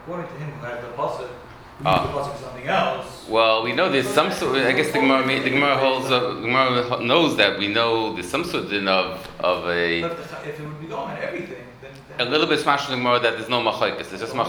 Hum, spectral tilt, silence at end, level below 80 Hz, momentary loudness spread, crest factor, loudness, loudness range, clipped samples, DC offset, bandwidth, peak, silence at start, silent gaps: none; -4.5 dB/octave; 0 s; -54 dBFS; 14 LU; 22 dB; -21 LUFS; 6 LU; under 0.1%; under 0.1%; over 20 kHz; 0 dBFS; 0 s; none